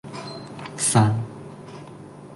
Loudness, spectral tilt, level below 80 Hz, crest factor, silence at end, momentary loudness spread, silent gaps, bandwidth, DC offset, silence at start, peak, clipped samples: -21 LUFS; -4.5 dB/octave; -56 dBFS; 22 dB; 0 s; 22 LU; none; 12 kHz; under 0.1%; 0.05 s; -4 dBFS; under 0.1%